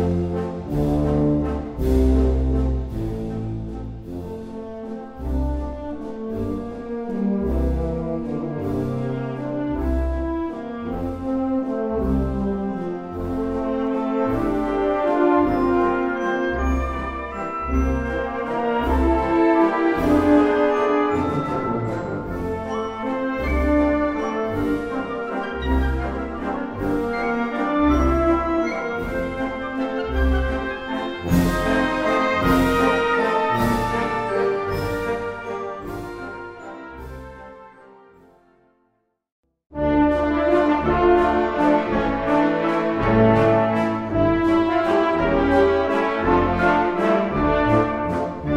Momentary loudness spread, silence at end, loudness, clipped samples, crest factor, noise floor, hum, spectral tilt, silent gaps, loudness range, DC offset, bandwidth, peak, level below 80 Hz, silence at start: 11 LU; 0 s; -21 LUFS; under 0.1%; 16 dB; -69 dBFS; none; -7.5 dB/octave; 39.32-39.43 s; 9 LU; under 0.1%; 16 kHz; -4 dBFS; -30 dBFS; 0 s